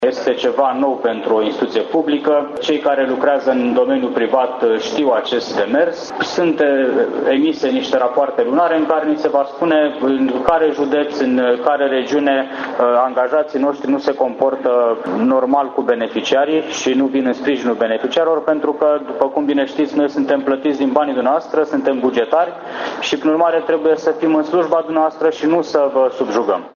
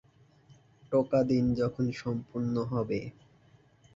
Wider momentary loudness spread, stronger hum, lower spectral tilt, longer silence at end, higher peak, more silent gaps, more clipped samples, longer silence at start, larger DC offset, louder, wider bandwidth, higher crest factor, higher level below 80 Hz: second, 3 LU vs 9 LU; neither; second, -4.5 dB/octave vs -8.5 dB/octave; second, 0.05 s vs 0.85 s; first, 0 dBFS vs -14 dBFS; neither; neither; second, 0 s vs 0.5 s; neither; first, -16 LUFS vs -30 LUFS; about the same, 7.2 kHz vs 7.6 kHz; about the same, 16 dB vs 16 dB; about the same, -58 dBFS vs -58 dBFS